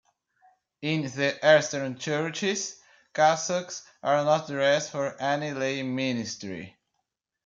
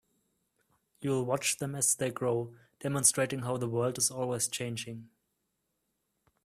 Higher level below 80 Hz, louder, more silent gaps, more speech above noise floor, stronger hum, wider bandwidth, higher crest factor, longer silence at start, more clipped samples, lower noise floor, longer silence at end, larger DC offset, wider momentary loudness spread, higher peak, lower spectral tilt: about the same, -74 dBFS vs -70 dBFS; first, -26 LUFS vs -30 LUFS; neither; first, 54 dB vs 50 dB; neither; second, 7.6 kHz vs 15.5 kHz; about the same, 20 dB vs 24 dB; second, 0.8 s vs 1 s; neither; about the same, -81 dBFS vs -81 dBFS; second, 0.75 s vs 1.4 s; neither; about the same, 14 LU vs 14 LU; about the same, -8 dBFS vs -10 dBFS; about the same, -4 dB/octave vs -3.5 dB/octave